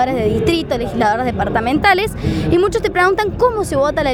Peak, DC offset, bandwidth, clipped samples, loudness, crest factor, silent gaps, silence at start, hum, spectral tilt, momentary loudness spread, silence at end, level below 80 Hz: 0 dBFS; under 0.1%; 18.5 kHz; under 0.1%; -16 LUFS; 14 dB; none; 0 s; none; -6 dB/octave; 4 LU; 0 s; -32 dBFS